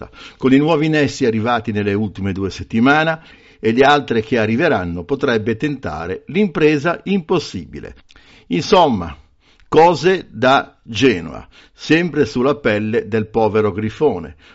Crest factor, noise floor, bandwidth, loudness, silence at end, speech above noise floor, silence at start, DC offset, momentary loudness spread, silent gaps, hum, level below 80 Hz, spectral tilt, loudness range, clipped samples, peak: 16 dB; -51 dBFS; 8 kHz; -16 LUFS; 0.2 s; 34 dB; 0 s; under 0.1%; 12 LU; none; none; -46 dBFS; -4.5 dB/octave; 3 LU; under 0.1%; -2 dBFS